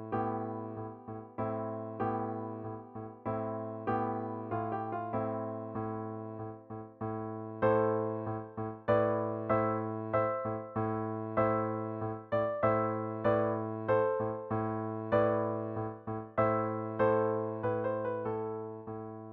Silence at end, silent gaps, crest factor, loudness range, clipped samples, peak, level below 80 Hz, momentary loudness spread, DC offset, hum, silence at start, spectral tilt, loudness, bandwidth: 0 s; none; 18 dB; 6 LU; under 0.1%; -16 dBFS; -66 dBFS; 12 LU; under 0.1%; none; 0 s; -8 dB/octave; -34 LUFS; 4.4 kHz